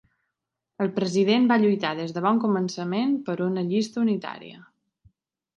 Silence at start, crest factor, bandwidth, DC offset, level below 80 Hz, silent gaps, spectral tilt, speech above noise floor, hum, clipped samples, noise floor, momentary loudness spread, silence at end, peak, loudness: 0.8 s; 18 dB; 9 kHz; under 0.1%; -72 dBFS; none; -6 dB/octave; 60 dB; none; under 0.1%; -83 dBFS; 10 LU; 0.95 s; -8 dBFS; -24 LUFS